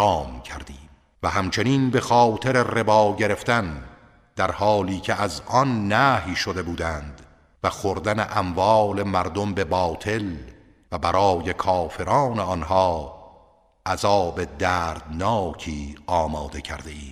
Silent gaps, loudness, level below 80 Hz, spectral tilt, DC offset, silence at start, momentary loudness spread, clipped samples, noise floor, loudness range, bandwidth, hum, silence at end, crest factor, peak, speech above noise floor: none; -22 LUFS; -42 dBFS; -5.5 dB/octave; under 0.1%; 0 s; 15 LU; under 0.1%; -56 dBFS; 3 LU; 15.5 kHz; none; 0 s; 20 dB; -4 dBFS; 34 dB